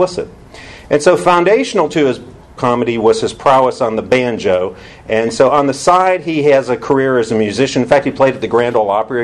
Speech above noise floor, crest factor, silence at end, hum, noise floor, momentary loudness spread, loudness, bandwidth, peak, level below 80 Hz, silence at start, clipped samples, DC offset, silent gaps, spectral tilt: 22 dB; 12 dB; 0 s; none; -35 dBFS; 7 LU; -13 LUFS; 11.5 kHz; 0 dBFS; -46 dBFS; 0 s; under 0.1%; under 0.1%; none; -5 dB/octave